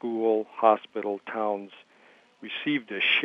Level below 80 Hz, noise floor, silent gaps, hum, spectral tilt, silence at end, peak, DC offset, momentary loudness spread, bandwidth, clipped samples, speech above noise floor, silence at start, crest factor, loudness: -88 dBFS; -58 dBFS; none; none; -6 dB/octave; 0 s; -6 dBFS; under 0.1%; 13 LU; 6 kHz; under 0.1%; 31 dB; 0.05 s; 22 dB; -27 LUFS